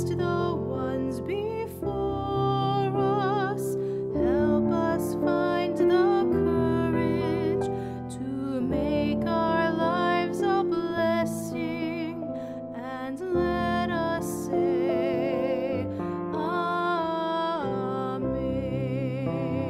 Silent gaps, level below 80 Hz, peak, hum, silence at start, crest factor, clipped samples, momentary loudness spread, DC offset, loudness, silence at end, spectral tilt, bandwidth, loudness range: none; -48 dBFS; -12 dBFS; none; 0 s; 14 dB; under 0.1%; 7 LU; under 0.1%; -27 LUFS; 0 s; -7 dB/octave; 15 kHz; 4 LU